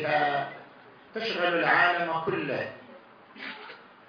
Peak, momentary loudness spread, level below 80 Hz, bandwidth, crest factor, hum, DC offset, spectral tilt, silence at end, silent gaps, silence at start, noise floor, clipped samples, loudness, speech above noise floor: -10 dBFS; 21 LU; -74 dBFS; 6.6 kHz; 20 dB; none; under 0.1%; -6 dB/octave; 0.25 s; none; 0 s; -52 dBFS; under 0.1%; -26 LUFS; 25 dB